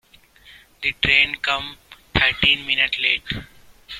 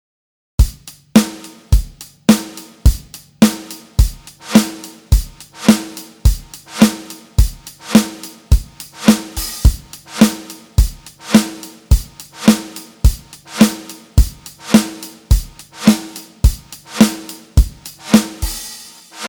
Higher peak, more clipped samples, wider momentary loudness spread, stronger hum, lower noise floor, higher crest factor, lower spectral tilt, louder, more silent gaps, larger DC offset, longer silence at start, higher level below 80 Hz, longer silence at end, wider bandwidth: about the same, -2 dBFS vs 0 dBFS; second, under 0.1% vs 0.3%; second, 12 LU vs 18 LU; neither; first, -50 dBFS vs -36 dBFS; first, 22 dB vs 16 dB; second, -3.5 dB/octave vs -5 dB/octave; about the same, -18 LUFS vs -16 LUFS; neither; neither; second, 0.45 s vs 0.6 s; second, -42 dBFS vs -20 dBFS; about the same, 0 s vs 0 s; second, 16 kHz vs over 20 kHz